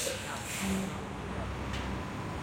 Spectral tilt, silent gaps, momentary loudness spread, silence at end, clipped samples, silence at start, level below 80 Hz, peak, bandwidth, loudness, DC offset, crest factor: -4 dB/octave; none; 5 LU; 0 s; under 0.1%; 0 s; -46 dBFS; -20 dBFS; 16.5 kHz; -36 LUFS; under 0.1%; 16 dB